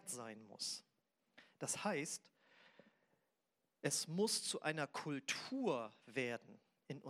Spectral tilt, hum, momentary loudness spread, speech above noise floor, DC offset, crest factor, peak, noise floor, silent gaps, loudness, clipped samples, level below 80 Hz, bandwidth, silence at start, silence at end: -3 dB/octave; none; 11 LU; 44 dB; under 0.1%; 22 dB; -24 dBFS; -88 dBFS; none; -43 LUFS; under 0.1%; under -90 dBFS; 16 kHz; 0.05 s; 0 s